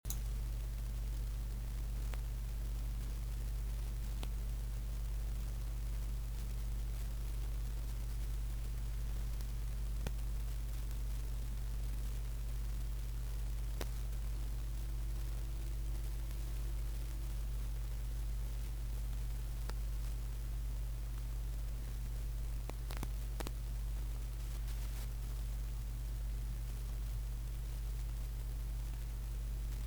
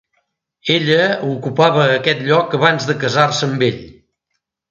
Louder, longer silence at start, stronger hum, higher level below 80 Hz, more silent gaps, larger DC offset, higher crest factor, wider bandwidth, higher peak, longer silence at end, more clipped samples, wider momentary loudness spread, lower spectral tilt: second, -43 LUFS vs -15 LUFS; second, 0.05 s vs 0.65 s; first, 50 Hz at -40 dBFS vs none; first, -40 dBFS vs -56 dBFS; neither; neither; about the same, 16 dB vs 16 dB; first, over 20 kHz vs 7.8 kHz; second, -22 dBFS vs 0 dBFS; second, 0 s vs 0.8 s; neither; second, 1 LU vs 7 LU; about the same, -5 dB/octave vs -5 dB/octave